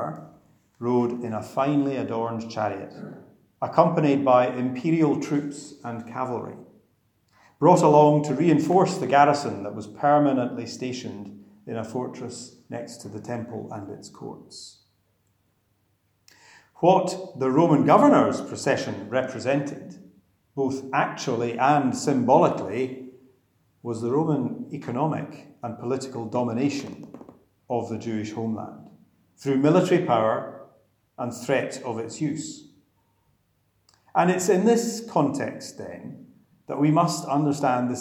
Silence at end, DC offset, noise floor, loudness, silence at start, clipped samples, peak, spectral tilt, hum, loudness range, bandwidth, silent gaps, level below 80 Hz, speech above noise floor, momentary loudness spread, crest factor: 0 s; under 0.1%; -69 dBFS; -23 LUFS; 0 s; under 0.1%; -2 dBFS; -6.5 dB/octave; none; 11 LU; 14 kHz; none; -72 dBFS; 46 dB; 19 LU; 22 dB